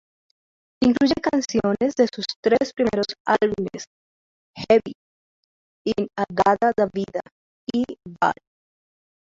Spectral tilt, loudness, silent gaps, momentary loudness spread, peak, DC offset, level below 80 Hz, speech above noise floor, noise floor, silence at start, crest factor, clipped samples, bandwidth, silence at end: -5 dB/octave; -22 LUFS; 2.36-2.43 s, 3.20-3.25 s, 3.87-4.54 s, 4.95-5.85 s, 7.32-7.67 s; 13 LU; -4 dBFS; under 0.1%; -56 dBFS; over 69 dB; under -90 dBFS; 0.8 s; 18 dB; under 0.1%; 7.8 kHz; 1.05 s